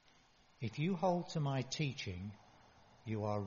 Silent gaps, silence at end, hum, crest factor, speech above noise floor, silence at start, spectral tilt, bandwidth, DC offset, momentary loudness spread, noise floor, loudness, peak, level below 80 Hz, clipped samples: none; 0 s; none; 18 dB; 30 dB; 0.6 s; -6 dB/octave; 7.2 kHz; under 0.1%; 14 LU; -68 dBFS; -39 LUFS; -22 dBFS; -70 dBFS; under 0.1%